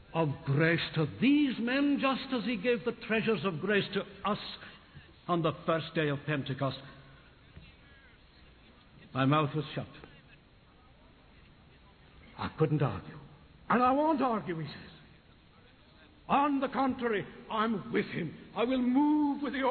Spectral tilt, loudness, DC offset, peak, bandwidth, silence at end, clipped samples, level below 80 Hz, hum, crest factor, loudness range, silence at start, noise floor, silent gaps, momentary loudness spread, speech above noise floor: -10 dB/octave; -31 LUFS; under 0.1%; -14 dBFS; 4.6 kHz; 0 s; under 0.1%; -62 dBFS; none; 18 dB; 8 LU; 0.1 s; -60 dBFS; none; 15 LU; 29 dB